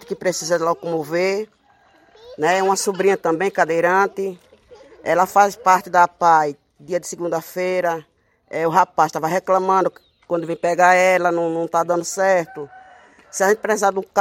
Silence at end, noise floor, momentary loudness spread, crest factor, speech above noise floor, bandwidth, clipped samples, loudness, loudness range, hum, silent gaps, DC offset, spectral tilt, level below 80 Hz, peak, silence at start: 0 s; -55 dBFS; 11 LU; 18 dB; 37 dB; 16.5 kHz; under 0.1%; -19 LUFS; 3 LU; none; none; under 0.1%; -4 dB/octave; -66 dBFS; 0 dBFS; 0.1 s